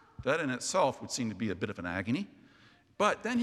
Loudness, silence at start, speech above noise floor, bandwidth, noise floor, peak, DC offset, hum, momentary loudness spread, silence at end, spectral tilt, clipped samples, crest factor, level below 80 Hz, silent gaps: -32 LUFS; 0.2 s; 30 dB; 14 kHz; -62 dBFS; -12 dBFS; under 0.1%; none; 7 LU; 0 s; -4 dB/octave; under 0.1%; 22 dB; -66 dBFS; none